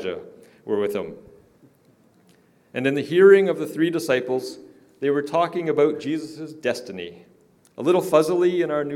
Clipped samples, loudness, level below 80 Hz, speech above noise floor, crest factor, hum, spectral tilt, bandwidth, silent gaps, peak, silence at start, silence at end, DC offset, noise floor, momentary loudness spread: under 0.1%; -21 LUFS; -70 dBFS; 37 dB; 20 dB; none; -6 dB/octave; 14.5 kHz; none; -2 dBFS; 0 s; 0 s; under 0.1%; -58 dBFS; 19 LU